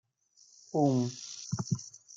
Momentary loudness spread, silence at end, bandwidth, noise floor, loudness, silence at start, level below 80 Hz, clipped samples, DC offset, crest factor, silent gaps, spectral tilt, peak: 10 LU; 0.2 s; 9.2 kHz; -64 dBFS; -33 LUFS; 0.75 s; -72 dBFS; under 0.1%; under 0.1%; 18 dB; none; -6.5 dB/octave; -16 dBFS